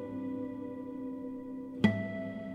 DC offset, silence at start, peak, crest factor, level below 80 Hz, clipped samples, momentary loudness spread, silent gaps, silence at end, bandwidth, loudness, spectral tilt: under 0.1%; 0 s; -12 dBFS; 24 dB; -66 dBFS; under 0.1%; 11 LU; none; 0 s; 8.6 kHz; -36 LUFS; -8 dB/octave